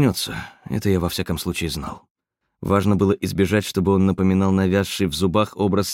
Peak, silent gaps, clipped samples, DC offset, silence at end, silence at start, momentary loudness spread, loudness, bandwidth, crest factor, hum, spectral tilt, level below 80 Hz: -4 dBFS; 2.11-2.15 s; under 0.1%; under 0.1%; 0 s; 0 s; 10 LU; -21 LUFS; 16.5 kHz; 16 dB; none; -6 dB/octave; -44 dBFS